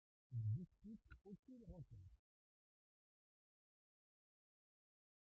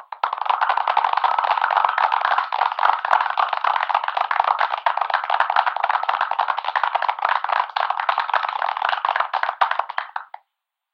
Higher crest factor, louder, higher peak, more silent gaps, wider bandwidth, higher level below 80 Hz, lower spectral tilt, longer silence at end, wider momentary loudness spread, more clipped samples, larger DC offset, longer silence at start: about the same, 18 dB vs 22 dB; second, -53 LUFS vs -21 LUFS; second, -38 dBFS vs 0 dBFS; first, 1.39-1.43 s vs none; second, 2.9 kHz vs 7 kHz; first, -74 dBFS vs -82 dBFS; first, -11 dB/octave vs 0.5 dB/octave; first, 3.05 s vs 0.7 s; first, 16 LU vs 4 LU; neither; neither; first, 0.3 s vs 0 s